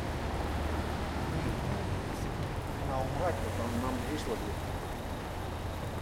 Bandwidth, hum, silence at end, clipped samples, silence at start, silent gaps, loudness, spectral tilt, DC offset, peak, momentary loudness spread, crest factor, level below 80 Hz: 16.5 kHz; none; 0 s; under 0.1%; 0 s; none; -35 LUFS; -6 dB/octave; under 0.1%; -18 dBFS; 5 LU; 16 dB; -42 dBFS